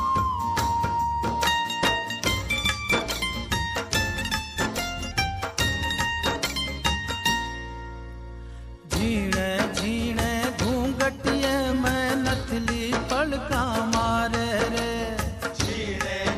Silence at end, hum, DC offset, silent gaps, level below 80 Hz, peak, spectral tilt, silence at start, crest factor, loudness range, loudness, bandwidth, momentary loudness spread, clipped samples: 0 s; none; under 0.1%; none; -38 dBFS; -6 dBFS; -4 dB/octave; 0 s; 20 dB; 3 LU; -25 LUFS; 15.5 kHz; 6 LU; under 0.1%